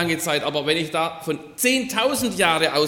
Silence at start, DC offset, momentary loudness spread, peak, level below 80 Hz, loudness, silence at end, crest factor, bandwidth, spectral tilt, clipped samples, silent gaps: 0 s; under 0.1%; 7 LU; -4 dBFS; -56 dBFS; -21 LUFS; 0 s; 18 dB; 17.5 kHz; -3 dB/octave; under 0.1%; none